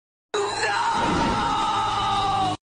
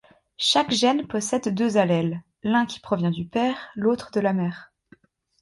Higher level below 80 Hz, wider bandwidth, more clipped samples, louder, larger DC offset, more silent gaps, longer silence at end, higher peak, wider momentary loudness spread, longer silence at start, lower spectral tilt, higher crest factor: first, -42 dBFS vs -62 dBFS; second, 10 kHz vs 11.5 kHz; neither; about the same, -23 LUFS vs -23 LUFS; neither; neither; second, 0.1 s vs 0.75 s; second, -12 dBFS vs -6 dBFS; about the same, 4 LU vs 6 LU; about the same, 0.35 s vs 0.4 s; second, -3.5 dB/octave vs -5 dB/octave; second, 12 dB vs 18 dB